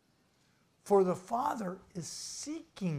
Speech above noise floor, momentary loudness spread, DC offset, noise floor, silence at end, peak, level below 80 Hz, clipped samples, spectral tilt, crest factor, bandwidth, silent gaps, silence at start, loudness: 37 dB; 14 LU; under 0.1%; -71 dBFS; 0 s; -16 dBFS; -72 dBFS; under 0.1%; -5.5 dB/octave; 20 dB; 15 kHz; none; 0.85 s; -34 LUFS